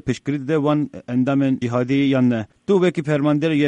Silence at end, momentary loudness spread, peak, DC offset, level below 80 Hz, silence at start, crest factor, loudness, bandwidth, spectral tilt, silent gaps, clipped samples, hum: 0 s; 6 LU; -6 dBFS; under 0.1%; -56 dBFS; 0.05 s; 12 dB; -20 LUFS; 9.2 kHz; -7.5 dB/octave; none; under 0.1%; none